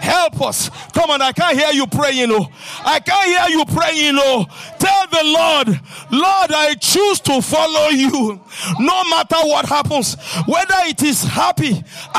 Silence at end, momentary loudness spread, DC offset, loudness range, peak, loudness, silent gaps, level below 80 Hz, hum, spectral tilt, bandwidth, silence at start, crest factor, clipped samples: 0 s; 7 LU; under 0.1%; 2 LU; -2 dBFS; -15 LUFS; none; -52 dBFS; none; -3.5 dB/octave; 15.5 kHz; 0 s; 12 dB; under 0.1%